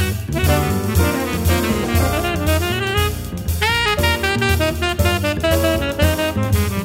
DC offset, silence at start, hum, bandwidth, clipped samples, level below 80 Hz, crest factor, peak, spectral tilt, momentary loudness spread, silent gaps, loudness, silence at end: under 0.1%; 0 s; none; 16.5 kHz; under 0.1%; -26 dBFS; 16 dB; -2 dBFS; -5 dB/octave; 3 LU; none; -18 LUFS; 0 s